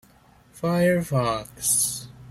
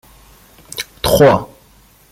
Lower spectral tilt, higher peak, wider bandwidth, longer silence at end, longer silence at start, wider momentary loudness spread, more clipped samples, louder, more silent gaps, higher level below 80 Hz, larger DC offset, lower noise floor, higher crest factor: about the same, -4 dB/octave vs -5 dB/octave; second, -10 dBFS vs -2 dBFS; about the same, 16.5 kHz vs 16.5 kHz; second, 0 s vs 0.65 s; second, 0.55 s vs 0.75 s; second, 8 LU vs 19 LU; neither; second, -23 LUFS vs -13 LUFS; neither; second, -54 dBFS vs -38 dBFS; neither; first, -55 dBFS vs -48 dBFS; about the same, 16 dB vs 16 dB